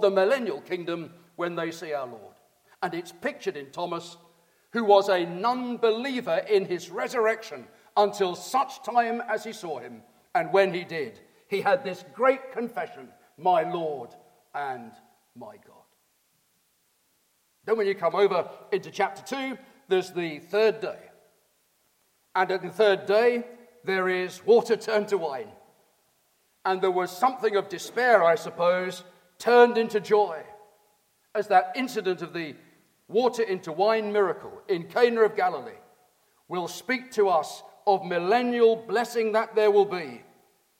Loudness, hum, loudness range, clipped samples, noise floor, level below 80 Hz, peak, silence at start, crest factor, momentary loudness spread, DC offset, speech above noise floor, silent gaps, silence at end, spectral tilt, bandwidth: -26 LUFS; none; 8 LU; under 0.1%; -69 dBFS; -80 dBFS; -6 dBFS; 0 s; 22 dB; 15 LU; under 0.1%; 44 dB; none; 0.6 s; -4.5 dB/octave; 16.5 kHz